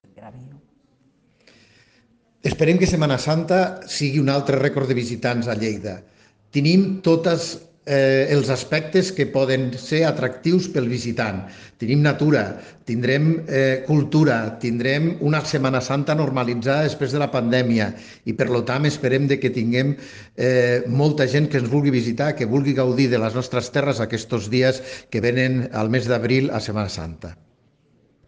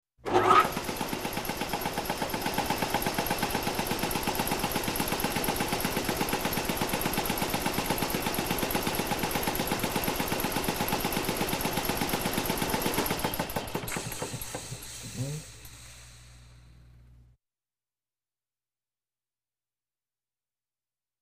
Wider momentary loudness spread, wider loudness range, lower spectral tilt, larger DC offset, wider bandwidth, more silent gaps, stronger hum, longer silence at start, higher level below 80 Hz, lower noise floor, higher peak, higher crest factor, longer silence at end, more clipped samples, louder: about the same, 9 LU vs 7 LU; second, 2 LU vs 9 LU; first, -6.5 dB/octave vs -3.5 dB/octave; neither; second, 9.6 kHz vs 15.5 kHz; neither; neither; about the same, 0.2 s vs 0.25 s; second, -54 dBFS vs -46 dBFS; second, -60 dBFS vs under -90 dBFS; first, -4 dBFS vs -8 dBFS; second, 16 dB vs 22 dB; second, 0.95 s vs 4.7 s; neither; first, -20 LUFS vs -29 LUFS